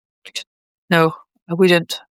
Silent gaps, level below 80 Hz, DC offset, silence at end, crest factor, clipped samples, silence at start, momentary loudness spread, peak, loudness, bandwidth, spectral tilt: 0.47-0.88 s, 1.42-1.46 s; -68 dBFS; under 0.1%; 0.15 s; 18 dB; under 0.1%; 0.25 s; 16 LU; -2 dBFS; -17 LUFS; 16.5 kHz; -5.5 dB/octave